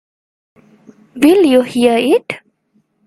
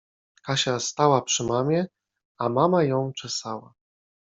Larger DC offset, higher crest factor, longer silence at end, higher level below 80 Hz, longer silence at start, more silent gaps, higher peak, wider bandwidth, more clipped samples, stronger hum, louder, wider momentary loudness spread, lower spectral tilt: neither; second, 14 dB vs 20 dB; about the same, 0.7 s vs 0.8 s; first, -56 dBFS vs -64 dBFS; first, 1.15 s vs 0.45 s; second, none vs 2.25-2.35 s; first, 0 dBFS vs -4 dBFS; first, 15.5 kHz vs 8.2 kHz; neither; neither; first, -12 LUFS vs -24 LUFS; about the same, 13 LU vs 13 LU; about the same, -4.5 dB/octave vs -4.5 dB/octave